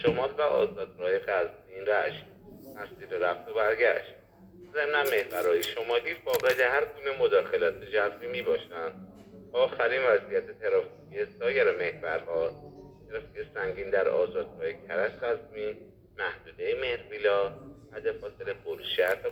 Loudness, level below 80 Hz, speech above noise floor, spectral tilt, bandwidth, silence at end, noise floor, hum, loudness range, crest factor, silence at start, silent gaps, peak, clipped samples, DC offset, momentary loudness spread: -29 LUFS; -62 dBFS; 23 dB; -4 dB/octave; over 20 kHz; 0 s; -52 dBFS; none; 5 LU; 20 dB; 0 s; none; -10 dBFS; under 0.1%; under 0.1%; 14 LU